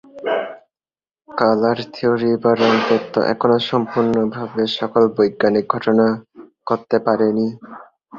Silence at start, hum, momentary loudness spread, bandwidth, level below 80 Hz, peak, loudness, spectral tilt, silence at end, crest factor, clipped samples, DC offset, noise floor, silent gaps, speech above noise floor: 0.15 s; none; 8 LU; 7.2 kHz; -60 dBFS; 0 dBFS; -18 LUFS; -7 dB/octave; 0 s; 18 dB; under 0.1%; under 0.1%; under -90 dBFS; none; over 73 dB